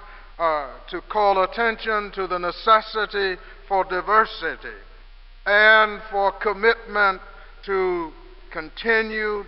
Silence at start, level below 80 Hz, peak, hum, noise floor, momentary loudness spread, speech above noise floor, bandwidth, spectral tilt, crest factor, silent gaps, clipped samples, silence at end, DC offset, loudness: 0 s; -44 dBFS; -2 dBFS; none; -44 dBFS; 17 LU; 22 dB; 5.8 kHz; -7.5 dB/octave; 20 dB; none; under 0.1%; 0 s; 0.1%; -21 LUFS